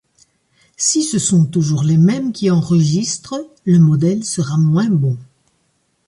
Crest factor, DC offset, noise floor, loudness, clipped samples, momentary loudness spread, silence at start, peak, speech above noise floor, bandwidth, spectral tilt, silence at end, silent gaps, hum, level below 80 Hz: 12 dB; under 0.1%; -64 dBFS; -15 LUFS; under 0.1%; 8 LU; 0.8 s; -4 dBFS; 49 dB; 11.5 kHz; -6 dB/octave; 0.85 s; none; none; -54 dBFS